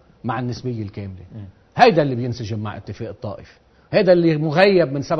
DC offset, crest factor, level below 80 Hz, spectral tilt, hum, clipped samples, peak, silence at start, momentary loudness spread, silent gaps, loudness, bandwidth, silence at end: under 0.1%; 20 dB; -52 dBFS; -7 dB/octave; none; under 0.1%; 0 dBFS; 0.25 s; 20 LU; none; -18 LUFS; 6.4 kHz; 0 s